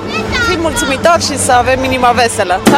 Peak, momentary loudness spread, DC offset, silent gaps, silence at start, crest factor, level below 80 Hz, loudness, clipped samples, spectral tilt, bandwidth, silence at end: 0 dBFS; 4 LU; under 0.1%; none; 0 s; 12 dB; -30 dBFS; -11 LUFS; 0.2%; -3.5 dB/octave; 16.5 kHz; 0 s